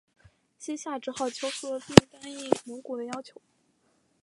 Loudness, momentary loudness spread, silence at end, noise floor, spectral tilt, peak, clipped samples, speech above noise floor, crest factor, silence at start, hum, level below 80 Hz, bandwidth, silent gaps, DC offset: -27 LUFS; 20 LU; 0.95 s; -70 dBFS; -5 dB/octave; 0 dBFS; under 0.1%; 43 dB; 28 dB; 0.6 s; none; -52 dBFS; 11.5 kHz; none; under 0.1%